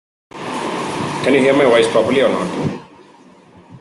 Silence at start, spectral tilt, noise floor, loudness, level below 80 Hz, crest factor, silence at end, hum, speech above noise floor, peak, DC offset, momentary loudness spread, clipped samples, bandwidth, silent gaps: 0.35 s; -5 dB/octave; -45 dBFS; -16 LUFS; -56 dBFS; 16 dB; 0 s; none; 31 dB; -2 dBFS; under 0.1%; 13 LU; under 0.1%; 12 kHz; none